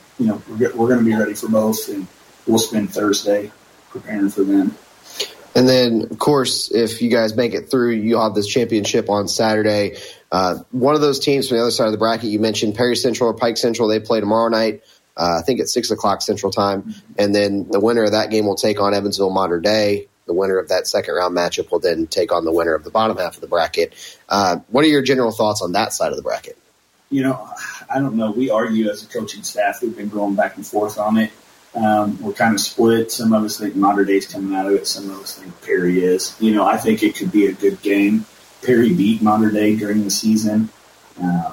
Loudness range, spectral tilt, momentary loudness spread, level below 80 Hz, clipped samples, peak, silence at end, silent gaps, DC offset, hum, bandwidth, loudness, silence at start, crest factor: 4 LU; -4.5 dB/octave; 9 LU; -56 dBFS; under 0.1%; -4 dBFS; 0 s; none; under 0.1%; none; 16.5 kHz; -18 LUFS; 0.2 s; 14 dB